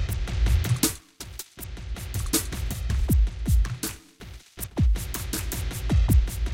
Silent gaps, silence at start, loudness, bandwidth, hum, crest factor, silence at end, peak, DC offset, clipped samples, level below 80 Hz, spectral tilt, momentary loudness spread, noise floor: none; 0 s; -26 LUFS; 17 kHz; none; 16 dB; 0 s; -10 dBFS; under 0.1%; under 0.1%; -26 dBFS; -4.5 dB/octave; 15 LU; -44 dBFS